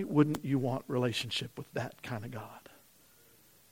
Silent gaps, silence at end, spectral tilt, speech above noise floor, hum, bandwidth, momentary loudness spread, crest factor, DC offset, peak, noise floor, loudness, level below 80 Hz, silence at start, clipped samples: none; 1.1 s; -6 dB/octave; 29 dB; none; 16.5 kHz; 16 LU; 22 dB; under 0.1%; -12 dBFS; -63 dBFS; -34 LUFS; -70 dBFS; 0 s; under 0.1%